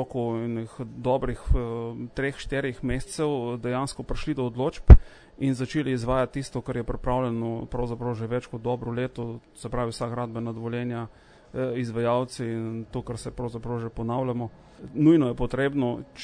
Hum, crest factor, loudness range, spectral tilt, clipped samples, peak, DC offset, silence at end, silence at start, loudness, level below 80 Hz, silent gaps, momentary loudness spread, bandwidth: none; 24 dB; 8 LU; -7.5 dB/octave; under 0.1%; 0 dBFS; under 0.1%; 0 s; 0 s; -27 LUFS; -28 dBFS; none; 11 LU; 10 kHz